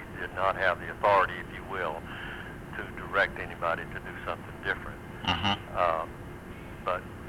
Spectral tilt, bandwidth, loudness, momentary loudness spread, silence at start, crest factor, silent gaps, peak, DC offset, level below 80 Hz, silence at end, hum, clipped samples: -5 dB/octave; 16.5 kHz; -31 LUFS; 14 LU; 0 s; 20 dB; none; -10 dBFS; under 0.1%; -50 dBFS; 0 s; none; under 0.1%